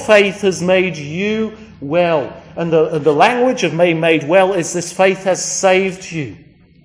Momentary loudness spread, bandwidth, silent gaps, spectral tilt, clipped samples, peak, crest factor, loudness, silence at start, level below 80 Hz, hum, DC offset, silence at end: 12 LU; 10.5 kHz; none; -4.5 dB/octave; under 0.1%; 0 dBFS; 14 dB; -15 LUFS; 0 s; -54 dBFS; none; under 0.1%; 0.45 s